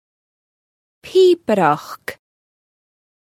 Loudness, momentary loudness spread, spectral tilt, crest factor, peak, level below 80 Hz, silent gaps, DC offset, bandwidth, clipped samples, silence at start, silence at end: -16 LUFS; 18 LU; -6 dB/octave; 20 dB; 0 dBFS; -64 dBFS; none; under 0.1%; 14.5 kHz; under 0.1%; 1.05 s; 1.1 s